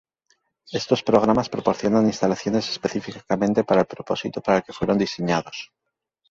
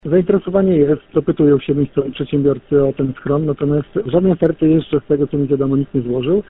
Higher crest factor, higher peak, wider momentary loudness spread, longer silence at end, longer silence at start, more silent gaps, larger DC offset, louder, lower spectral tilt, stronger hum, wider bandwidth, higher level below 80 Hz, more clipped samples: first, 20 dB vs 14 dB; about the same, -2 dBFS vs -2 dBFS; first, 10 LU vs 5 LU; first, 0.65 s vs 0.05 s; first, 0.7 s vs 0.05 s; neither; neither; second, -22 LUFS vs -16 LUFS; second, -5.5 dB/octave vs -8.5 dB/octave; neither; first, 7.8 kHz vs 4 kHz; second, -54 dBFS vs -42 dBFS; neither